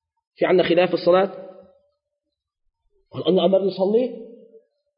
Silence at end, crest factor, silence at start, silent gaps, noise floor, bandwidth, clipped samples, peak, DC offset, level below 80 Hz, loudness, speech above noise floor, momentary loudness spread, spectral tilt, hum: 0.65 s; 18 dB; 0.4 s; none; -81 dBFS; 5.4 kHz; under 0.1%; -6 dBFS; under 0.1%; -68 dBFS; -20 LUFS; 63 dB; 15 LU; -11 dB/octave; none